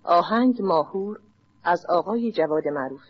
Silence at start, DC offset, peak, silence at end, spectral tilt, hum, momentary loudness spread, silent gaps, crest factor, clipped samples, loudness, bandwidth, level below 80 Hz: 0.05 s; under 0.1%; -8 dBFS; 0.15 s; -4.5 dB/octave; none; 10 LU; none; 16 dB; under 0.1%; -23 LUFS; 6.4 kHz; -72 dBFS